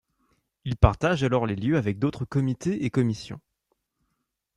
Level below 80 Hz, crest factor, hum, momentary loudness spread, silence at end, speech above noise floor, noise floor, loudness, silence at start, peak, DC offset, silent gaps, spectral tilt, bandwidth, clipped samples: -38 dBFS; 22 dB; none; 13 LU; 1.2 s; 54 dB; -79 dBFS; -25 LUFS; 0.65 s; -4 dBFS; under 0.1%; none; -7.5 dB/octave; 10.5 kHz; under 0.1%